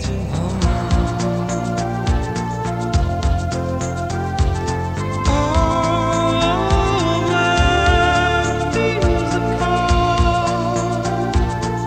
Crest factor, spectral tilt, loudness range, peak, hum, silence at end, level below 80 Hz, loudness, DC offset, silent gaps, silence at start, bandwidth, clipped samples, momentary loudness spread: 16 dB; -5.5 dB/octave; 5 LU; -2 dBFS; none; 0 s; -24 dBFS; -18 LUFS; under 0.1%; none; 0 s; 9.6 kHz; under 0.1%; 7 LU